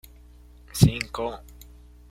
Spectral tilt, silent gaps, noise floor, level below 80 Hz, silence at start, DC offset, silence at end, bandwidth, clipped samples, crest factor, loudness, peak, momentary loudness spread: -6 dB/octave; none; -49 dBFS; -40 dBFS; 0.75 s; under 0.1%; 0.7 s; 16.5 kHz; under 0.1%; 24 dB; -24 LUFS; -2 dBFS; 16 LU